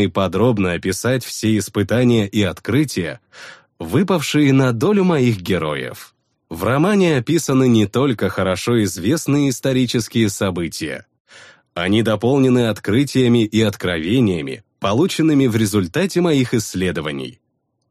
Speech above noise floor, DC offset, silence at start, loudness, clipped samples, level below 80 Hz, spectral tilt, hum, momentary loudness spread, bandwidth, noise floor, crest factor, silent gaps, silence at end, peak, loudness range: 29 dB; under 0.1%; 0 s; -17 LUFS; under 0.1%; -50 dBFS; -6 dB/octave; none; 10 LU; 15.5 kHz; -45 dBFS; 14 dB; 11.20-11.25 s; 0.6 s; -4 dBFS; 2 LU